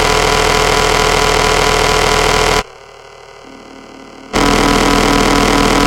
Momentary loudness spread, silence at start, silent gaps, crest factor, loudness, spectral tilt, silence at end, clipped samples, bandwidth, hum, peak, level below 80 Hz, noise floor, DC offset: 3 LU; 0 s; none; 12 dB; -11 LUFS; -3 dB/octave; 0 s; under 0.1%; 17 kHz; none; 0 dBFS; -24 dBFS; -36 dBFS; under 0.1%